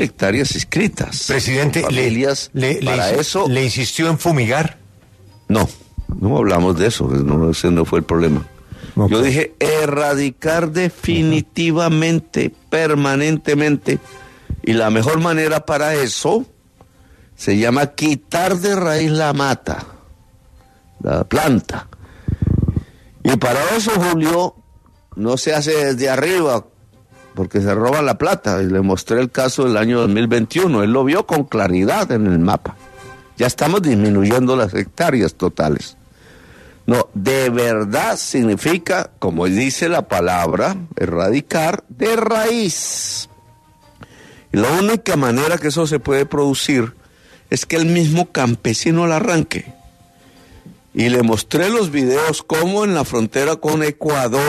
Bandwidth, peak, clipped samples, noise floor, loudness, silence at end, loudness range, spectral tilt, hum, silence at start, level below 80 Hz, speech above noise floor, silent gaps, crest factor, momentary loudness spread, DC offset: 13.5 kHz; -2 dBFS; under 0.1%; -49 dBFS; -17 LUFS; 0 s; 3 LU; -5 dB/octave; none; 0 s; -40 dBFS; 33 dB; none; 16 dB; 7 LU; under 0.1%